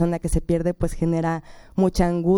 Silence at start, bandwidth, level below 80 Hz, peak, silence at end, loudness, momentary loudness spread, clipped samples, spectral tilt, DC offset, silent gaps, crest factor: 0 s; 16 kHz; -32 dBFS; -6 dBFS; 0 s; -23 LUFS; 7 LU; under 0.1%; -7.5 dB/octave; under 0.1%; none; 16 dB